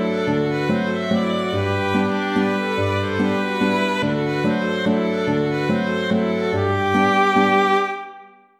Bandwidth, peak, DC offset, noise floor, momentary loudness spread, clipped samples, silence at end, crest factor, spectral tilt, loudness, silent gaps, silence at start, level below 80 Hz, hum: 13.5 kHz; -6 dBFS; under 0.1%; -43 dBFS; 5 LU; under 0.1%; 0.35 s; 14 dB; -6.5 dB/octave; -20 LUFS; none; 0 s; -56 dBFS; none